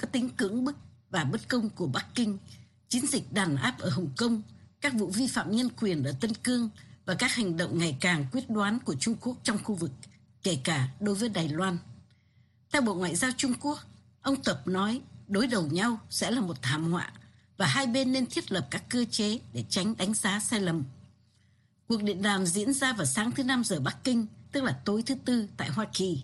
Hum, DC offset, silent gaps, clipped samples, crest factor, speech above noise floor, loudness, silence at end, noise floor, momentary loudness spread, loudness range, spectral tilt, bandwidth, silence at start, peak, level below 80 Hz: none; under 0.1%; none; under 0.1%; 18 dB; 36 dB; -30 LUFS; 0 s; -66 dBFS; 6 LU; 2 LU; -4 dB/octave; 12.5 kHz; 0 s; -12 dBFS; -64 dBFS